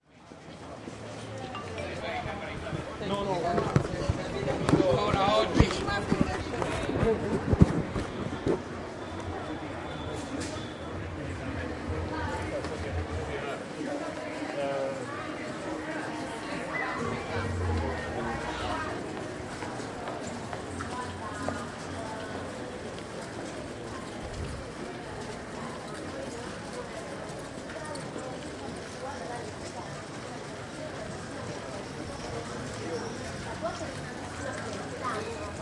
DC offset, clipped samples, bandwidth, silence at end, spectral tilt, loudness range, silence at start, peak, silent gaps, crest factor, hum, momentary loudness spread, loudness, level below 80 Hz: under 0.1%; under 0.1%; 11.5 kHz; 0 s; -5.5 dB/octave; 11 LU; 0.15 s; -4 dBFS; none; 28 dB; none; 11 LU; -33 LUFS; -46 dBFS